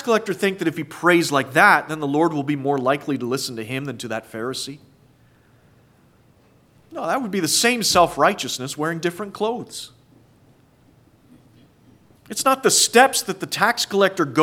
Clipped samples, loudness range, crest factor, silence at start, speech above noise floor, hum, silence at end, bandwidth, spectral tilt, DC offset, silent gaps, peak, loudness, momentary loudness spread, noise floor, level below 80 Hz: under 0.1%; 12 LU; 22 dB; 0 s; 35 dB; none; 0 s; 18 kHz; -3 dB/octave; under 0.1%; none; 0 dBFS; -20 LUFS; 14 LU; -55 dBFS; -60 dBFS